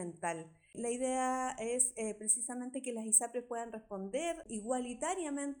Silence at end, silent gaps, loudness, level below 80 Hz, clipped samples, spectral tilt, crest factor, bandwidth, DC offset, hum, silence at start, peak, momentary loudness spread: 0 s; none; -35 LUFS; -70 dBFS; under 0.1%; -2.5 dB/octave; 22 dB; 19.5 kHz; under 0.1%; none; 0 s; -14 dBFS; 13 LU